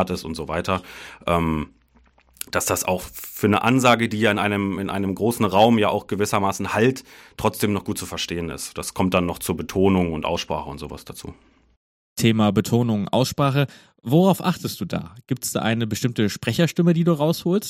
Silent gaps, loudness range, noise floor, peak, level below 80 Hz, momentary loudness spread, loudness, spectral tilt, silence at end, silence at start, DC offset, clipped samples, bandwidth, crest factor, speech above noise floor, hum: 11.77-12.16 s; 5 LU; -57 dBFS; -2 dBFS; -48 dBFS; 13 LU; -22 LUFS; -5.5 dB/octave; 0 s; 0 s; under 0.1%; under 0.1%; 17 kHz; 20 dB; 36 dB; none